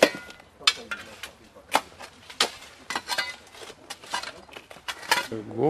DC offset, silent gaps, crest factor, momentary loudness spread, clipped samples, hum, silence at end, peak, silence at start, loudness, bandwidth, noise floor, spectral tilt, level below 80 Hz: under 0.1%; none; 28 dB; 20 LU; under 0.1%; none; 0 s; 0 dBFS; 0 s; -28 LUFS; 14.5 kHz; -46 dBFS; -2 dB/octave; -64 dBFS